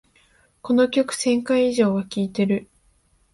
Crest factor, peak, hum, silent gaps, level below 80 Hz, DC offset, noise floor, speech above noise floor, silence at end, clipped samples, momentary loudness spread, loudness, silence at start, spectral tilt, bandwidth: 16 dB; -6 dBFS; none; none; -60 dBFS; under 0.1%; -61 dBFS; 41 dB; 0.7 s; under 0.1%; 7 LU; -21 LUFS; 0.65 s; -5.5 dB/octave; 11.5 kHz